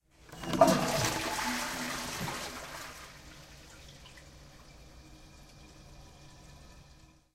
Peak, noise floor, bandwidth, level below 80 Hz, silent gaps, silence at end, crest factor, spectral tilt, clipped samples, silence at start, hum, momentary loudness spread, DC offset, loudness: -8 dBFS; -58 dBFS; 16 kHz; -56 dBFS; none; 0.4 s; 28 dB; -3.5 dB/octave; under 0.1%; 0.25 s; none; 27 LU; under 0.1%; -32 LUFS